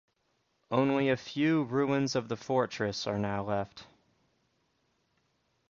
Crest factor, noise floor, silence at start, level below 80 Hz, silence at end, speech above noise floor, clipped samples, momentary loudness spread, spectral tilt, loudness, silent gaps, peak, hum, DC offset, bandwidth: 20 dB; -76 dBFS; 0.7 s; -64 dBFS; 1.85 s; 46 dB; under 0.1%; 6 LU; -6 dB/octave; -31 LUFS; none; -14 dBFS; none; under 0.1%; 7.6 kHz